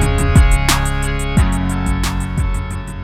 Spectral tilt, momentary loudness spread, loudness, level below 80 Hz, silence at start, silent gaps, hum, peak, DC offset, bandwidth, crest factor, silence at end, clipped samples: -5 dB/octave; 8 LU; -17 LUFS; -18 dBFS; 0 s; none; none; 0 dBFS; under 0.1%; 16.5 kHz; 14 dB; 0 s; under 0.1%